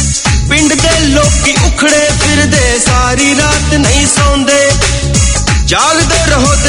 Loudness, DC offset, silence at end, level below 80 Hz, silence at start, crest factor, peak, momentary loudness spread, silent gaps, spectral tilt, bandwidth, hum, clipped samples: -8 LUFS; under 0.1%; 0 s; -16 dBFS; 0 s; 8 dB; 0 dBFS; 2 LU; none; -3.5 dB/octave; 12.5 kHz; none; 0.5%